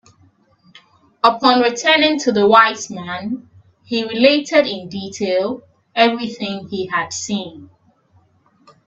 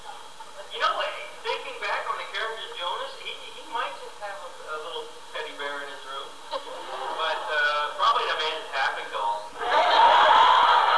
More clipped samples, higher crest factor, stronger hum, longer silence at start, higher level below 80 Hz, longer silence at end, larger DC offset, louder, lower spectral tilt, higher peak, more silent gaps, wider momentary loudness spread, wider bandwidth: neither; about the same, 18 dB vs 18 dB; neither; first, 1.25 s vs 0 s; about the same, -62 dBFS vs -66 dBFS; first, 1.2 s vs 0 s; second, under 0.1% vs 0.6%; first, -16 LUFS vs -24 LUFS; first, -3.5 dB/octave vs -0.5 dB/octave; first, 0 dBFS vs -8 dBFS; neither; second, 14 LU vs 20 LU; second, 8.4 kHz vs 11 kHz